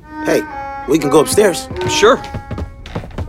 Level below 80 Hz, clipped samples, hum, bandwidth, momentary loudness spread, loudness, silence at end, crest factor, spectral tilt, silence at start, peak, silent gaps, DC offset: -36 dBFS; under 0.1%; none; 16.5 kHz; 16 LU; -14 LUFS; 0 s; 16 dB; -4 dB/octave; 0.05 s; 0 dBFS; none; under 0.1%